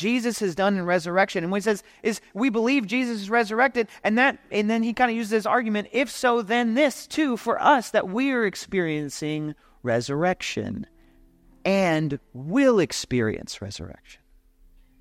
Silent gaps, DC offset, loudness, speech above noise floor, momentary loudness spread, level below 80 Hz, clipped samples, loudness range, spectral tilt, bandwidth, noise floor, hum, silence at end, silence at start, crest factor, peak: none; under 0.1%; -24 LUFS; 33 dB; 10 LU; -58 dBFS; under 0.1%; 4 LU; -5 dB/octave; 16 kHz; -56 dBFS; none; 0.85 s; 0 s; 18 dB; -6 dBFS